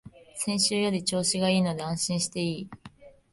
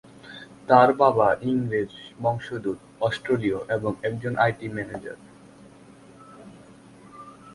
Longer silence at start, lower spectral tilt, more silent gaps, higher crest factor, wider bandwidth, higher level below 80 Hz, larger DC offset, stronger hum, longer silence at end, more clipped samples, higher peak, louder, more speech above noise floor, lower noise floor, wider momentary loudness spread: second, 0.05 s vs 0.25 s; second, -4 dB/octave vs -7 dB/octave; neither; second, 18 dB vs 24 dB; about the same, 11.5 kHz vs 11.5 kHz; about the same, -62 dBFS vs -58 dBFS; neither; neither; first, 0.25 s vs 0 s; neither; second, -10 dBFS vs -2 dBFS; second, -27 LUFS vs -24 LUFS; about the same, 23 dB vs 26 dB; about the same, -51 dBFS vs -49 dBFS; second, 11 LU vs 24 LU